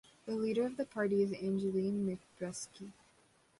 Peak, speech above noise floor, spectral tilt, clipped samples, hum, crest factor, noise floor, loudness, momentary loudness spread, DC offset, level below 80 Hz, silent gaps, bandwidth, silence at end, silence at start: -22 dBFS; 33 dB; -6 dB/octave; under 0.1%; none; 16 dB; -69 dBFS; -36 LUFS; 12 LU; under 0.1%; -72 dBFS; none; 11.5 kHz; 0.7 s; 0.25 s